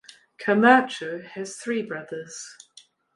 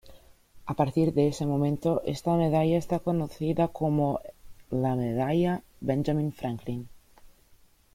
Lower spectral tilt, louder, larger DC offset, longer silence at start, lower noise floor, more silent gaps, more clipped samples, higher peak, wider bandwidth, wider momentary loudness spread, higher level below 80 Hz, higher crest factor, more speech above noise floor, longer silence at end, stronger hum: second, -4.5 dB/octave vs -8 dB/octave; first, -23 LUFS vs -28 LUFS; neither; first, 0.4 s vs 0.05 s; second, -55 dBFS vs -59 dBFS; neither; neither; first, -2 dBFS vs -12 dBFS; second, 11.5 kHz vs 16 kHz; first, 20 LU vs 10 LU; second, -76 dBFS vs -54 dBFS; first, 22 dB vs 16 dB; about the same, 32 dB vs 32 dB; about the same, 0.65 s vs 0.7 s; neither